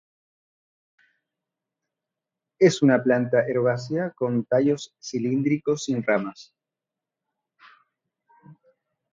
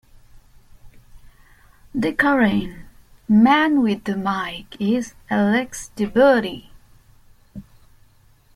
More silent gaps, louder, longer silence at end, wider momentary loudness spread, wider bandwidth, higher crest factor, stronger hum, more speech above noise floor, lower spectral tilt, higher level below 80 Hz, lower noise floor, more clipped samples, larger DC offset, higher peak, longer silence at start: neither; second, -23 LUFS vs -19 LUFS; second, 0.6 s vs 0.95 s; second, 10 LU vs 21 LU; second, 7.8 kHz vs 13.5 kHz; about the same, 22 dB vs 18 dB; neither; first, 65 dB vs 35 dB; about the same, -6 dB/octave vs -5.5 dB/octave; second, -70 dBFS vs -48 dBFS; first, -88 dBFS vs -54 dBFS; neither; neither; about the same, -6 dBFS vs -4 dBFS; first, 2.6 s vs 0.85 s